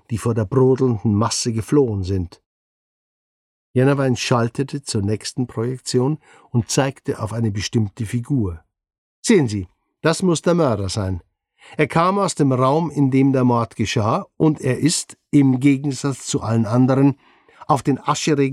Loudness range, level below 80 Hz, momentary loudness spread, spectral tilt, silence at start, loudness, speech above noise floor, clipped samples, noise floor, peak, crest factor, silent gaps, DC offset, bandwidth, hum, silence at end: 4 LU; -50 dBFS; 9 LU; -6 dB/octave; 0.1 s; -19 LUFS; over 72 dB; under 0.1%; under -90 dBFS; -2 dBFS; 16 dB; 2.46-3.74 s, 8.98-9.23 s; under 0.1%; 13 kHz; none; 0 s